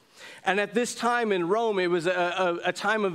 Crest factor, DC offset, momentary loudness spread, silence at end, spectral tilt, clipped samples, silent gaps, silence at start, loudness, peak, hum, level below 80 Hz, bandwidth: 20 dB; under 0.1%; 3 LU; 0 s; -4 dB/octave; under 0.1%; none; 0.2 s; -26 LUFS; -8 dBFS; none; -78 dBFS; 15.5 kHz